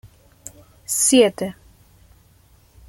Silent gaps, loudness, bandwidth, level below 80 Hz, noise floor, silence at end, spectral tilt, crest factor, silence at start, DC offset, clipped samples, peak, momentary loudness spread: none; -17 LUFS; 16.5 kHz; -56 dBFS; -54 dBFS; 1.35 s; -2.5 dB/octave; 20 dB; 0.9 s; under 0.1%; under 0.1%; -2 dBFS; 27 LU